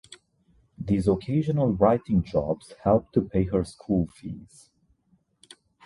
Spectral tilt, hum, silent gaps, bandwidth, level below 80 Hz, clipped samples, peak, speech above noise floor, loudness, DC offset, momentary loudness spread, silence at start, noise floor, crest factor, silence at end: -9 dB/octave; none; none; 11.5 kHz; -46 dBFS; under 0.1%; -8 dBFS; 42 dB; -25 LUFS; under 0.1%; 13 LU; 0.1 s; -67 dBFS; 18 dB; 1.4 s